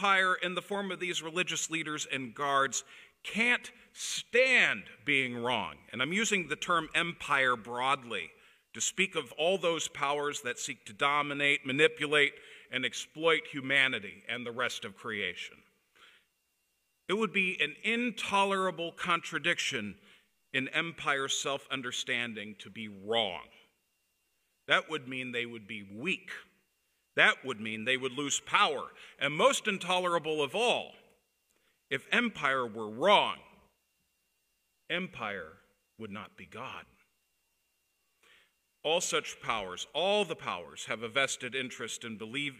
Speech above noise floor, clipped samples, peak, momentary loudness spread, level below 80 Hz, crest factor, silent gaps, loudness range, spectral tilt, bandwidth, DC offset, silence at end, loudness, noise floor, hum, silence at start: 46 dB; under 0.1%; -8 dBFS; 14 LU; -74 dBFS; 24 dB; none; 8 LU; -2.5 dB/octave; 15.5 kHz; under 0.1%; 0 s; -31 LUFS; -78 dBFS; none; 0 s